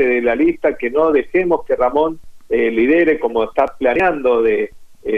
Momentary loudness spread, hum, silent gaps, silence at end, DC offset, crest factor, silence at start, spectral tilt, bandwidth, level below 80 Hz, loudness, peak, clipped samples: 7 LU; none; none; 0 s; under 0.1%; 14 dB; 0 s; -7 dB/octave; 6 kHz; -42 dBFS; -16 LUFS; -2 dBFS; under 0.1%